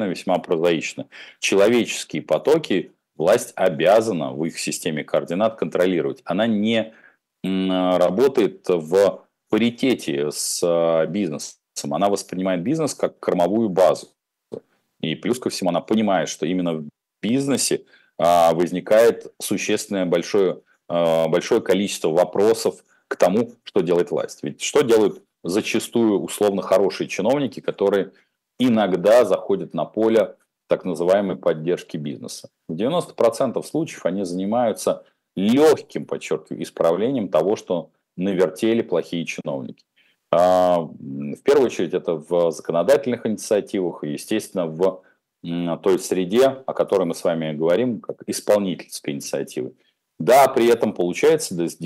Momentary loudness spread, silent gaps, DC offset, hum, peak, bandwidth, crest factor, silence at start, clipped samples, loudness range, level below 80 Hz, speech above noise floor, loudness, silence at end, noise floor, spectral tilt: 12 LU; none; under 0.1%; none; -4 dBFS; 16 kHz; 18 dB; 0 s; under 0.1%; 3 LU; -66 dBFS; 19 dB; -21 LUFS; 0 s; -39 dBFS; -5 dB/octave